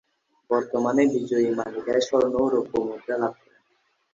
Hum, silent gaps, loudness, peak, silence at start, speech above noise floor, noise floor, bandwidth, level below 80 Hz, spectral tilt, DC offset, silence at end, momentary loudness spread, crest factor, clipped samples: none; none; -24 LUFS; -8 dBFS; 0.5 s; 46 dB; -69 dBFS; 7.8 kHz; -62 dBFS; -5.5 dB/octave; under 0.1%; 0.8 s; 7 LU; 16 dB; under 0.1%